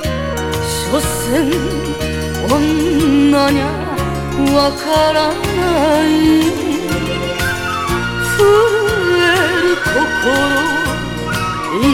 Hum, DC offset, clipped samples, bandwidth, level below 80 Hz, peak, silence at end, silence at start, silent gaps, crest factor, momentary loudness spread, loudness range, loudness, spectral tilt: none; under 0.1%; under 0.1%; 17.5 kHz; -30 dBFS; 0 dBFS; 0 s; 0 s; none; 14 dB; 8 LU; 2 LU; -14 LUFS; -4.5 dB/octave